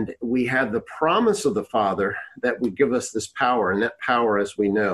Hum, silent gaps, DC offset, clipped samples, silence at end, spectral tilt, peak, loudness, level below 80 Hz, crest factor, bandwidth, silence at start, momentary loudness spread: none; none; under 0.1%; under 0.1%; 0 s; -4.5 dB/octave; -6 dBFS; -22 LUFS; -56 dBFS; 16 dB; 12.5 kHz; 0 s; 6 LU